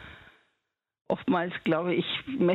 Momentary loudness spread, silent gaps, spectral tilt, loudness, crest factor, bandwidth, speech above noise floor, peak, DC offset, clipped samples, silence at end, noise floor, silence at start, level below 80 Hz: 6 LU; 1.01-1.05 s; -8 dB/octave; -29 LUFS; 18 dB; 4.6 kHz; 55 dB; -12 dBFS; under 0.1%; under 0.1%; 0 s; -82 dBFS; 0 s; -64 dBFS